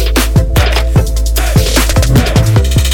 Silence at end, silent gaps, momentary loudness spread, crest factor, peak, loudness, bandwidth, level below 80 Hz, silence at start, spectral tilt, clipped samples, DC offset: 0 s; none; 3 LU; 8 dB; 0 dBFS; -11 LUFS; 19 kHz; -12 dBFS; 0 s; -5 dB/octave; under 0.1%; under 0.1%